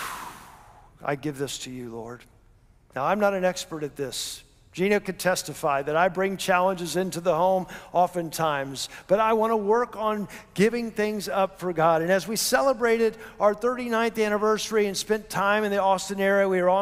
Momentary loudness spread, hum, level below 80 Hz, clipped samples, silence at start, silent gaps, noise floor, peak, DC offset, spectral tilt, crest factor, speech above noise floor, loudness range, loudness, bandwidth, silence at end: 12 LU; none; -58 dBFS; under 0.1%; 0 s; none; -57 dBFS; -8 dBFS; under 0.1%; -4 dB/octave; 18 dB; 32 dB; 6 LU; -25 LUFS; 16 kHz; 0 s